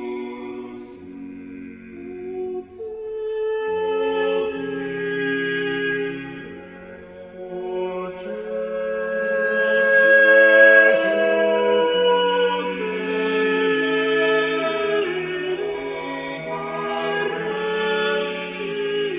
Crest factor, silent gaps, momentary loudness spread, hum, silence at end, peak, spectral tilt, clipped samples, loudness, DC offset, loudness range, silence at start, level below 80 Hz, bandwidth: 20 dB; none; 22 LU; none; 0 s; -2 dBFS; -8.5 dB/octave; under 0.1%; -20 LUFS; under 0.1%; 14 LU; 0 s; -60 dBFS; 4 kHz